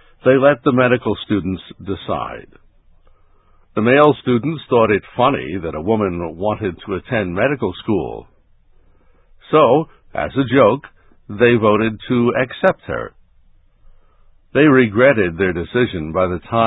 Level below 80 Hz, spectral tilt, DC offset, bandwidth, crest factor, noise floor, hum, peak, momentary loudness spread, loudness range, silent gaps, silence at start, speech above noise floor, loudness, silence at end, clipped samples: -44 dBFS; -10 dB/octave; under 0.1%; 4 kHz; 18 dB; -51 dBFS; none; 0 dBFS; 14 LU; 5 LU; none; 0.25 s; 35 dB; -17 LUFS; 0 s; under 0.1%